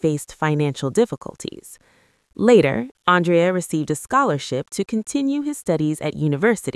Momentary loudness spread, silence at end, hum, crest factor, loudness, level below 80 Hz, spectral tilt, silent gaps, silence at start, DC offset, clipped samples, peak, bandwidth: 10 LU; 0.05 s; none; 20 dB; -20 LUFS; -56 dBFS; -6 dB/octave; 2.91-2.95 s; 0.05 s; under 0.1%; under 0.1%; 0 dBFS; 12 kHz